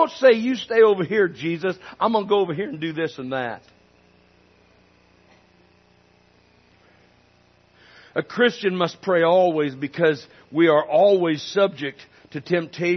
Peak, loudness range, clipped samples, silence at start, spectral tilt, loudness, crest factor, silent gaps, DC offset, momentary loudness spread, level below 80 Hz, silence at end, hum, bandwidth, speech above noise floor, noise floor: -4 dBFS; 14 LU; under 0.1%; 0 s; -6 dB/octave; -21 LUFS; 18 dB; none; under 0.1%; 13 LU; -70 dBFS; 0 s; 60 Hz at -55 dBFS; 6.4 kHz; 37 dB; -58 dBFS